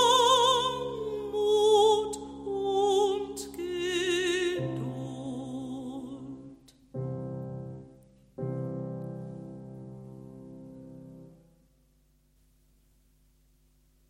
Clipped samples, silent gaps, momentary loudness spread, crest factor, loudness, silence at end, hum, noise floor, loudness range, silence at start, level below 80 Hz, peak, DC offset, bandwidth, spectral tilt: under 0.1%; none; 25 LU; 20 dB; -29 LUFS; 2.75 s; none; -66 dBFS; 21 LU; 0 s; -60 dBFS; -12 dBFS; under 0.1%; 15.5 kHz; -4 dB/octave